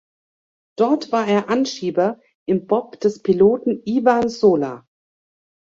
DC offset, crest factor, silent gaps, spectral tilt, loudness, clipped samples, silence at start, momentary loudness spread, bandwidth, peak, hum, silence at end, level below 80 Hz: under 0.1%; 18 dB; 2.35-2.46 s; -6 dB/octave; -19 LUFS; under 0.1%; 0.8 s; 7 LU; 7.6 kHz; -2 dBFS; none; 1 s; -60 dBFS